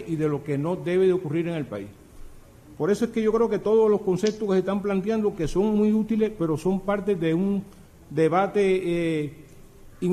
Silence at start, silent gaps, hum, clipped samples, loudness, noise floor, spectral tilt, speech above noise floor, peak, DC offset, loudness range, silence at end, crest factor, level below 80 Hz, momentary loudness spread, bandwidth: 0 s; none; none; under 0.1%; -24 LUFS; -47 dBFS; -7.5 dB/octave; 23 dB; -10 dBFS; under 0.1%; 3 LU; 0 s; 14 dB; -48 dBFS; 8 LU; 14 kHz